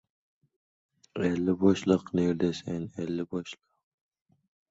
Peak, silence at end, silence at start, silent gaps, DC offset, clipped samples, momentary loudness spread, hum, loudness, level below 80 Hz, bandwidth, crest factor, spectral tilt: -10 dBFS; 1.15 s; 1.15 s; none; under 0.1%; under 0.1%; 14 LU; none; -29 LUFS; -58 dBFS; 8 kHz; 22 dB; -7 dB/octave